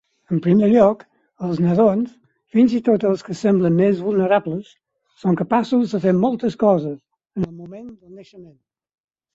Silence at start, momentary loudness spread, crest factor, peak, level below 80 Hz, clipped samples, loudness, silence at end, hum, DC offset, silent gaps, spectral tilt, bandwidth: 0.3 s; 15 LU; 18 dB; -2 dBFS; -58 dBFS; under 0.1%; -18 LUFS; 0.9 s; none; under 0.1%; none; -8.5 dB/octave; 8 kHz